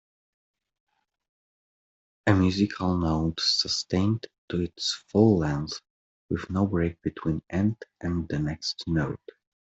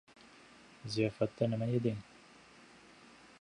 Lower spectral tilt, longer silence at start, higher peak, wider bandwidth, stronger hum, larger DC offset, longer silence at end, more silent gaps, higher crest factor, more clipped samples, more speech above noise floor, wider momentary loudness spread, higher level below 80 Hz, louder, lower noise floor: second, -5.5 dB/octave vs -7 dB/octave; first, 2.25 s vs 0.25 s; first, -8 dBFS vs -18 dBFS; second, 8.2 kHz vs 10.5 kHz; neither; neither; second, 0.6 s vs 1.4 s; first, 4.38-4.48 s, 5.90-6.29 s vs none; about the same, 20 dB vs 20 dB; neither; first, over 64 dB vs 25 dB; second, 11 LU vs 24 LU; first, -50 dBFS vs -70 dBFS; first, -27 LUFS vs -35 LUFS; first, under -90 dBFS vs -59 dBFS